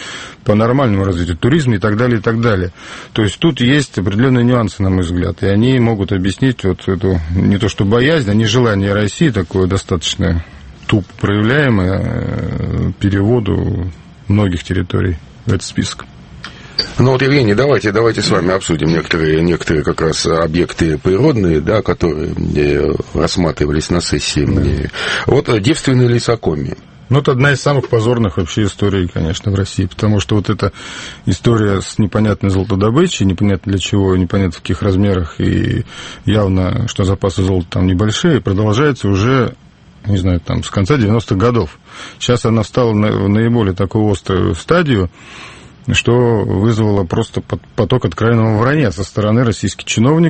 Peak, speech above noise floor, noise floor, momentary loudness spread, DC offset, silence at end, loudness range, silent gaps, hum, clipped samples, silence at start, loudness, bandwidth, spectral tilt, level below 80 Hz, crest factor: 0 dBFS; 19 dB; -33 dBFS; 7 LU; under 0.1%; 0 s; 2 LU; none; none; under 0.1%; 0 s; -14 LUFS; 8.8 kHz; -6 dB/octave; -32 dBFS; 14 dB